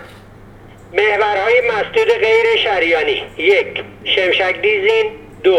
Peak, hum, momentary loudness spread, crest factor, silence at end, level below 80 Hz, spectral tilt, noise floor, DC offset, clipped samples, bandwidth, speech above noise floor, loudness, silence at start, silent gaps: 0 dBFS; none; 6 LU; 16 dB; 0 s; -48 dBFS; -4 dB/octave; -39 dBFS; under 0.1%; under 0.1%; 10 kHz; 24 dB; -14 LUFS; 0 s; none